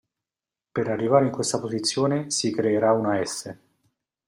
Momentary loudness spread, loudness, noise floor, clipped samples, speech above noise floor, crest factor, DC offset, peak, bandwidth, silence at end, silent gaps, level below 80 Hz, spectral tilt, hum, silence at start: 10 LU; -24 LUFS; under -90 dBFS; under 0.1%; over 67 dB; 20 dB; under 0.1%; -6 dBFS; 16 kHz; 0.7 s; none; -66 dBFS; -4.5 dB/octave; none; 0.75 s